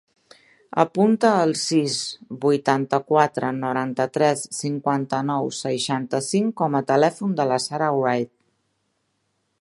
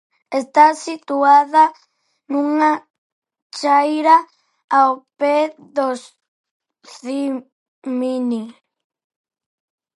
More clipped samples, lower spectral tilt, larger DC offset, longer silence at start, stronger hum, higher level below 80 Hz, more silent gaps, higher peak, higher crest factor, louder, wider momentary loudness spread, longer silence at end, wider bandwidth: neither; first, -5 dB/octave vs -3.5 dB/octave; neither; first, 0.75 s vs 0.3 s; neither; first, -70 dBFS vs -80 dBFS; second, none vs 2.90-3.22 s, 3.42-3.50 s, 4.64-4.68 s, 6.28-6.44 s, 6.51-6.60 s, 7.52-7.82 s; about the same, 0 dBFS vs 0 dBFS; about the same, 22 dB vs 18 dB; second, -22 LUFS vs -17 LUFS; second, 7 LU vs 14 LU; about the same, 1.35 s vs 1.45 s; about the same, 11.5 kHz vs 11.5 kHz